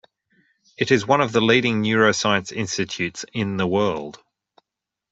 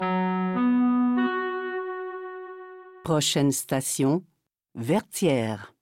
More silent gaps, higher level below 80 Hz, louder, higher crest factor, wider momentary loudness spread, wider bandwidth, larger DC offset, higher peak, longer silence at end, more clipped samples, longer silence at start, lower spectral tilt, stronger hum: neither; first, -60 dBFS vs -66 dBFS; first, -20 LUFS vs -25 LUFS; first, 20 dB vs 14 dB; second, 9 LU vs 16 LU; second, 8 kHz vs 16.5 kHz; neither; first, -2 dBFS vs -10 dBFS; first, 0.95 s vs 0.15 s; neither; first, 0.8 s vs 0 s; about the same, -4.5 dB/octave vs -5 dB/octave; neither